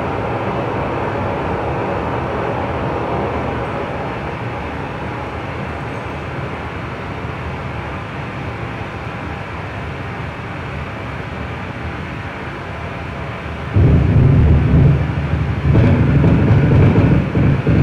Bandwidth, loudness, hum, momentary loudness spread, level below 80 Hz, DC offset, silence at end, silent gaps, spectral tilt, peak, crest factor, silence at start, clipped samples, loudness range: 7.2 kHz; -18 LUFS; none; 13 LU; -26 dBFS; under 0.1%; 0 s; none; -9 dB/octave; -4 dBFS; 12 dB; 0 s; under 0.1%; 12 LU